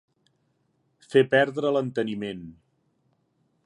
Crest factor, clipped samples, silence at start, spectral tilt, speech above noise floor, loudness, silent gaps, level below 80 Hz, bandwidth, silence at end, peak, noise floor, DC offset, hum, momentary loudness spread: 22 dB; under 0.1%; 1.1 s; -6.5 dB/octave; 47 dB; -24 LUFS; none; -68 dBFS; 11 kHz; 1.15 s; -6 dBFS; -71 dBFS; under 0.1%; none; 14 LU